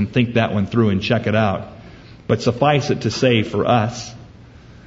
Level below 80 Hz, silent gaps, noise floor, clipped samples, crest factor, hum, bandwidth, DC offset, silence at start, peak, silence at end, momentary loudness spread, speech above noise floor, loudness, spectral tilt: -48 dBFS; none; -42 dBFS; under 0.1%; 18 dB; none; 7.8 kHz; under 0.1%; 0 s; -2 dBFS; 0.15 s; 12 LU; 24 dB; -18 LUFS; -6 dB/octave